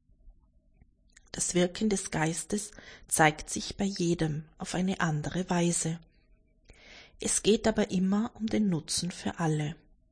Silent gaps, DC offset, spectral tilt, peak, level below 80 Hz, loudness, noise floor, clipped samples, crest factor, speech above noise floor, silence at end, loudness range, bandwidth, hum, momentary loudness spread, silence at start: none; under 0.1%; -4.5 dB/octave; -8 dBFS; -54 dBFS; -30 LUFS; -64 dBFS; under 0.1%; 24 dB; 34 dB; 0.35 s; 3 LU; 10.5 kHz; none; 10 LU; 0.25 s